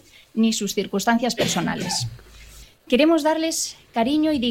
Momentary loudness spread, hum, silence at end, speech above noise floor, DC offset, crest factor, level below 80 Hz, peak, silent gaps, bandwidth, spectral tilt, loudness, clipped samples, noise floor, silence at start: 8 LU; none; 0 s; 24 dB; under 0.1%; 16 dB; -52 dBFS; -6 dBFS; none; 16.5 kHz; -4 dB/octave; -22 LUFS; under 0.1%; -45 dBFS; 0.35 s